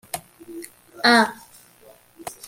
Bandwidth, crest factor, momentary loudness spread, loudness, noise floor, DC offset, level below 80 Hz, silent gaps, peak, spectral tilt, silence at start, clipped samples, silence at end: 16.5 kHz; 22 dB; 25 LU; -18 LUFS; -52 dBFS; under 0.1%; -66 dBFS; none; -4 dBFS; -2.5 dB/octave; 0.15 s; under 0.1%; 0.15 s